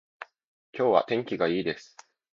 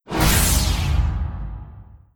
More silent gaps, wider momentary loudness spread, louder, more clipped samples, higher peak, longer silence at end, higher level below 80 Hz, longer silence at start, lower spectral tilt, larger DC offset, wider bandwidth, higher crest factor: first, 0.47-0.73 s vs none; first, 22 LU vs 18 LU; second, -27 LUFS vs -20 LUFS; neither; about the same, -6 dBFS vs -4 dBFS; first, 0.5 s vs 0.35 s; second, -68 dBFS vs -24 dBFS; about the same, 0.2 s vs 0.1 s; first, -6 dB/octave vs -3.5 dB/octave; neither; second, 7.6 kHz vs 18 kHz; first, 24 dB vs 16 dB